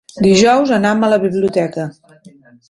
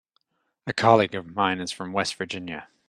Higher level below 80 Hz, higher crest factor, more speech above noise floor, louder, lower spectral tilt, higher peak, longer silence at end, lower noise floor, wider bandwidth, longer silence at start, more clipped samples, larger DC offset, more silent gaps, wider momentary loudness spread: first, -50 dBFS vs -66 dBFS; second, 14 dB vs 24 dB; second, 31 dB vs 48 dB; first, -13 LUFS vs -24 LUFS; about the same, -5 dB/octave vs -4.5 dB/octave; about the same, 0 dBFS vs -2 dBFS; first, 0.8 s vs 0.25 s; second, -44 dBFS vs -72 dBFS; second, 11.5 kHz vs 13 kHz; second, 0.15 s vs 0.65 s; neither; neither; neither; about the same, 12 LU vs 14 LU